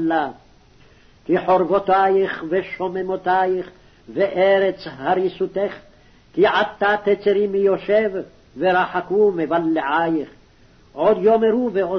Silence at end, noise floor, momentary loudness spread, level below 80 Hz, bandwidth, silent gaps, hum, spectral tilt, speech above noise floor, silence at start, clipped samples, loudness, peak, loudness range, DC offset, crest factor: 0 s; -51 dBFS; 11 LU; -56 dBFS; 6.2 kHz; none; none; -7.5 dB/octave; 32 dB; 0 s; under 0.1%; -19 LUFS; -6 dBFS; 2 LU; under 0.1%; 14 dB